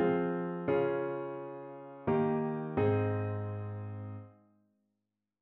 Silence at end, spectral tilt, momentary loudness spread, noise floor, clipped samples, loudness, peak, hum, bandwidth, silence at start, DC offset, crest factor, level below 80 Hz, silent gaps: 1.1 s; -8 dB/octave; 14 LU; -86 dBFS; under 0.1%; -34 LUFS; -18 dBFS; none; 4.1 kHz; 0 s; under 0.1%; 16 dB; -68 dBFS; none